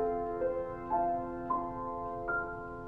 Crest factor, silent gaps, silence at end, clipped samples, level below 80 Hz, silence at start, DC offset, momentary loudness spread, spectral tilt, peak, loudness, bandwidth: 14 dB; none; 0 s; under 0.1%; -54 dBFS; 0 s; under 0.1%; 6 LU; -9.5 dB/octave; -20 dBFS; -35 LUFS; 5 kHz